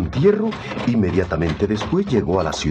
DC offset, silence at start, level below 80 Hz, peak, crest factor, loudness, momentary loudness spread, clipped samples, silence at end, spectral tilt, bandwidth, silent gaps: under 0.1%; 0 s; -40 dBFS; -4 dBFS; 16 dB; -20 LUFS; 5 LU; under 0.1%; 0 s; -6.5 dB/octave; 8.8 kHz; none